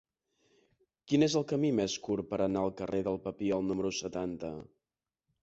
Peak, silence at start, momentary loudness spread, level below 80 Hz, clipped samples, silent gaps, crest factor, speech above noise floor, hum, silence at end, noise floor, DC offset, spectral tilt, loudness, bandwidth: -16 dBFS; 1.05 s; 9 LU; -62 dBFS; under 0.1%; none; 18 dB; over 58 dB; none; 0.8 s; under -90 dBFS; under 0.1%; -5.5 dB/octave; -33 LUFS; 8 kHz